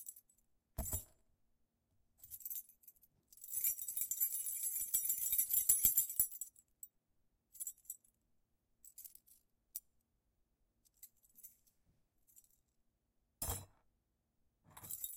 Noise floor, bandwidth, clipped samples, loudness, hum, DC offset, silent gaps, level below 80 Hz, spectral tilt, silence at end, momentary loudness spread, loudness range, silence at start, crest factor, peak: -83 dBFS; 17 kHz; under 0.1%; -36 LUFS; none; under 0.1%; none; -64 dBFS; -1 dB/octave; 0 s; 25 LU; 23 LU; 0 s; 30 dB; -14 dBFS